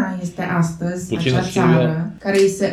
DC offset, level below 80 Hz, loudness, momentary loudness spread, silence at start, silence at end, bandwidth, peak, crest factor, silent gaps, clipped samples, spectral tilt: under 0.1%; -48 dBFS; -19 LUFS; 8 LU; 0 s; 0 s; 13 kHz; -2 dBFS; 16 dB; none; under 0.1%; -6 dB/octave